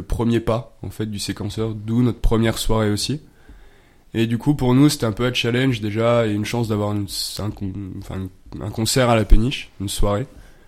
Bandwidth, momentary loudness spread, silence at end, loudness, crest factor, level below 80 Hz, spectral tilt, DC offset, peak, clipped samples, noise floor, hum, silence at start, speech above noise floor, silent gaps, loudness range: 15.5 kHz; 13 LU; 0.15 s; -21 LUFS; 20 dB; -26 dBFS; -5.5 dB/octave; under 0.1%; 0 dBFS; under 0.1%; -48 dBFS; none; 0 s; 29 dB; none; 3 LU